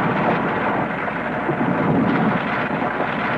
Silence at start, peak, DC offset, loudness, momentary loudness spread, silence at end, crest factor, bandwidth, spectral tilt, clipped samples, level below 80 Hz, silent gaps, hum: 0 s; -6 dBFS; under 0.1%; -20 LUFS; 5 LU; 0 s; 14 dB; 8 kHz; -8.5 dB/octave; under 0.1%; -48 dBFS; none; none